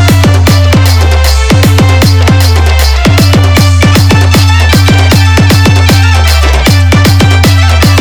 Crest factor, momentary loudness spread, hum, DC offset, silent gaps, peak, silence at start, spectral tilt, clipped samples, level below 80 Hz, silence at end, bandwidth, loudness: 4 dB; 2 LU; none; under 0.1%; none; 0 dBFS; 0 s; -5 dB/octave; 0.6%; -12 dBFS; 0 s; over 20 kHz; -5 LUFS